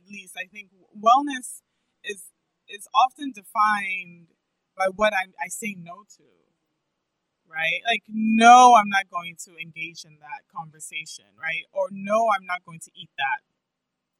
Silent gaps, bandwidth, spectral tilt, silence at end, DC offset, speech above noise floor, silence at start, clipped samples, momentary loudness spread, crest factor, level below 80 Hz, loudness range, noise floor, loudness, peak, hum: none; 13 kHz; -3 dB/octave; 0.85 s; under 0.1%; 59 dB; 0.1 s; under 0.1%; 22 LU; 22 dB; -70 dBFS; 11 LU; -82 dBFS; -21 LUFS; -2 dBFS; none